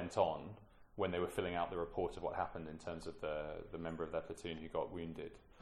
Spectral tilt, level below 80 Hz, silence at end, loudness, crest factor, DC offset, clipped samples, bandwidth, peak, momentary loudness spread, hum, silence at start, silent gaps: -6 dB/octave; -60 dBFS; 0 s; -42 LUFS; 22 dB; under 0.1%; under 0.1%; 14 kHz; -20 dBFS; 10 LU; none; 0 s; none